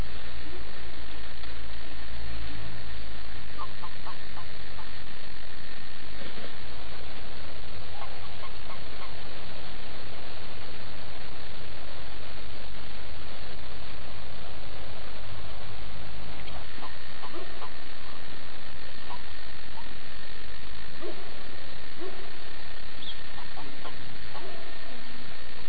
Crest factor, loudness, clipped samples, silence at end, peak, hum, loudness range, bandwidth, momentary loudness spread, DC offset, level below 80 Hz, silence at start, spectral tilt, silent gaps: 18 dB; -42 LUFS; under 0.1%; 0 s; -14 dBFS; none; 1 LU; 5 kHz; 2 LU; 20%; -48 dBFS; 0 s; -6.5 dB/octave; none